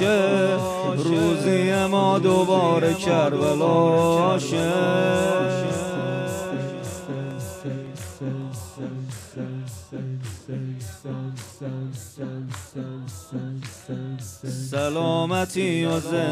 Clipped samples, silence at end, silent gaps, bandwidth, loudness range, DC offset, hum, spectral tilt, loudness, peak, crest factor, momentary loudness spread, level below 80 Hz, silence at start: under 0.1%; 0 s; none; 15.5 kHz; 14 LU; under 0.1%; none; -6 dB/octave; -23 LUFS; -8 dBFS; 16 dB; 15 LU; -62 dBFS; 0 s